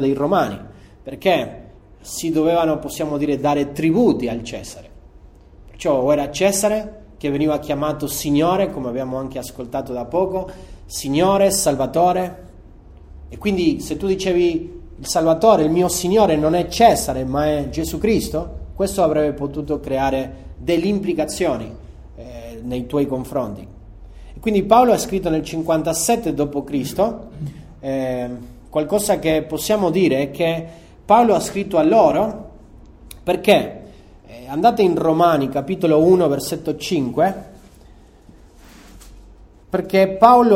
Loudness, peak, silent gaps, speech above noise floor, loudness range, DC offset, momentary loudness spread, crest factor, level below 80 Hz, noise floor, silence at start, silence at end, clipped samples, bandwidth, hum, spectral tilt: -18 LUFS; 0 dBFS; none; 28 dB; 5 LU; under 0.1%; 16 LU; 18 dB; -40 dBFS; -46 dBFS; 0 s; 0 s; under 0.1%; 16 kHz; none; -5 dB/octave